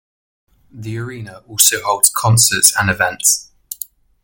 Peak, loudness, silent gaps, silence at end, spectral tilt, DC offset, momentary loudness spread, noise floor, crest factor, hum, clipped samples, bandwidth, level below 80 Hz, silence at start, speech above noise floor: 0 dBFS; -12 LUFS; none; 0.5 s; -2 dB/octave; under 0.1%; 20 LU; -35 dBFS; 18 dB; none; under 0.1%; over 20 kHz; -48 dBFS; 0.75 s; 20 dB